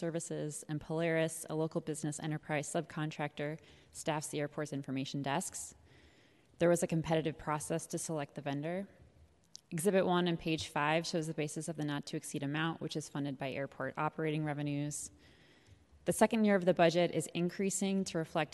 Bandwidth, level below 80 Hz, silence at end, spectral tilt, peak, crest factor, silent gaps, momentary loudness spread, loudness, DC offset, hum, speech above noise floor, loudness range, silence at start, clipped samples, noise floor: 12 kHz; -68 dBFS; 0.05 s; -5 dB/octave; -14 dBFS; 22 dB; none; 11 LU; -36 LUFS; under 0.1%; none; 30 dB; 6 LU; 0 s; under 0.1%; -66 dBFS